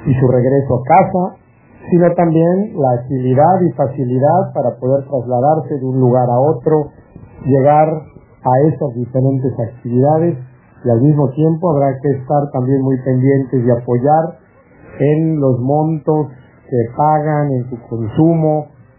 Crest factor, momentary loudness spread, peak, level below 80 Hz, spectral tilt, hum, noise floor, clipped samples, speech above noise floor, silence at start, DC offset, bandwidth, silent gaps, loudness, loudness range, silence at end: 14 dB; 8 LU; 0 dBFS; -46 dBFS; -13.5 dB/octave; none; -43 dBFS; under 0.1%; 30 dB; 0 s; under 0.1%; 3.1 kHz; none; -14 LUFS; 2 LU; 0.3 s